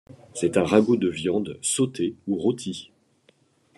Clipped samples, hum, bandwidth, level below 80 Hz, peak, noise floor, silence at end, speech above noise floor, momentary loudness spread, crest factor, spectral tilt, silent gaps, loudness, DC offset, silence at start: under 0.1%; none; 12.5 kHz; -62 dBFS; -4 dBFS; -62 dBFS; 0.9 s; 39 dB; 13 LU; 20 dB; -5 dB/octave; none; -24 LUFS; under 0.1%; 0.1 s